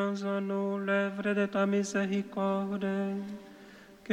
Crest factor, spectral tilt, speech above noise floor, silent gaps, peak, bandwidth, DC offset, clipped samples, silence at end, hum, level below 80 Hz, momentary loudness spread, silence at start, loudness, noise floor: 14 dB; -6 dB/octave; 22 dB; none; -16 dBFS; 10 kHz; under 0.1%; under 0.1%; 0 s; none; -72 dBFS; 15 LU; 0 s; -31 LUFS; -53 dBFS